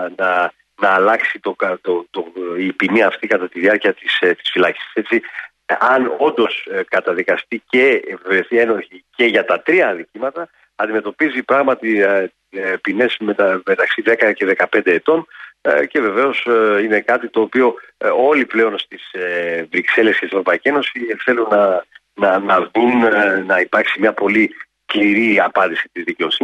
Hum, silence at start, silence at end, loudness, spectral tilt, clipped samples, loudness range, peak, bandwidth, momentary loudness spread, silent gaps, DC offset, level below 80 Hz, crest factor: none; 0 s; 0 s; -16 LUFS; -5.5 dB/octave; under 0.1%; 2 LU; -2 dBFS; 9.6 kHz; 8 LU; none; under 0.1%; -66 dBFS; 14 dB